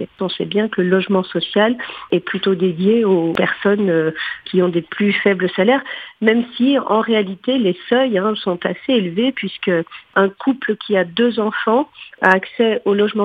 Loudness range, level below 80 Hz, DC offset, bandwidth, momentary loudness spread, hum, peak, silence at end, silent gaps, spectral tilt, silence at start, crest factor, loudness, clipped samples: 2 LU; -62 dBFS; under 0.1%; 5 kHz; 6 LU; none; 0 dBFS; 0 s; none; -8 dB/octave; 0 s; 16 dB; -17 LUFS; under 0.1%